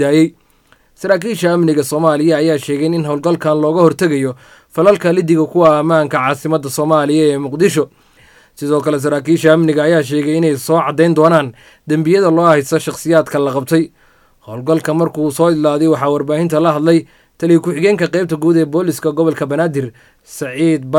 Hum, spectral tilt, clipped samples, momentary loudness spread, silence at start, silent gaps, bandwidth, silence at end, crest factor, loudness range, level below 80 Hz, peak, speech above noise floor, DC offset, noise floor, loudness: none; -6.5 dB/octave; under 0.1%; 7 LU; 0 s; none; 17 kHz; 0 s; 14 dB; 2 LU; -56 dBFS; 0 dBFS; 39 dB; under 0.1%; -52 dBFS; -13 LUFS